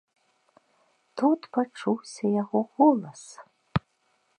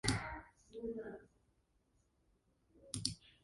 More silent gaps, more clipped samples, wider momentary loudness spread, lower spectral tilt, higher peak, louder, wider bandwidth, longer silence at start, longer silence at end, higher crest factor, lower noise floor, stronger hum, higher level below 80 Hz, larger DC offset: neither; neither; first, 21 LU vs 13 LU; first, -7 dB/octave vs -3.5 dB/octave; first, -8 dBFS vs -16 dBFS; first, -26 LUFS vs -44 LUFS; about the same, 10.5 kHz vs 11.5 kHz; first, 1.15 s vs 0.05 s; first, 0.6 s vs 0.15 s; second, 20 dB vs 30 dB; second, -70 dBFS vs -78 dBFS; neither; about the same, -58 dBFS vs -60 dBFS; neither